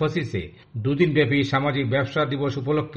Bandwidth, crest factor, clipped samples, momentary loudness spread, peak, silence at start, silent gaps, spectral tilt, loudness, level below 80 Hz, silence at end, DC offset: 8 kHz; 18 dB; under 0.1%; 10 LU; -6 dBFS; 0 s; none; -7.5 dB/octave; -23 LUFS; -50 dBFS; 0 s; under 0.1%